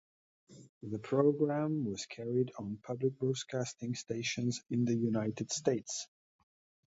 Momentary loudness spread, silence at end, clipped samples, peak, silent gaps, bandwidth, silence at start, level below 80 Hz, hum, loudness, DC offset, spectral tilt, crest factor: 11 LU; 0.8 s; under 0.1%; -16 dBFS; 0.69-0.81 s; 8 kHz; 0.5 s; -72 dBFS; none; -35 LUFS; under 0.1%; -5.5 dB/octave; 20 dB